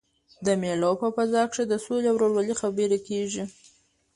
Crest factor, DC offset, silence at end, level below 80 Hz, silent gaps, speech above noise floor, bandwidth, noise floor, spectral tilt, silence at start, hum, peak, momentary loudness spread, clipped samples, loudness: 14 dB; under 0.1%; 0.65 s; -64 dBFS; none; 36 dB; 11.5 kHz; -61 dBFS; -5 dB/octave; 0.4 s; none; -12 dBFS; 8 LU; under 0.1%; -26 LUFS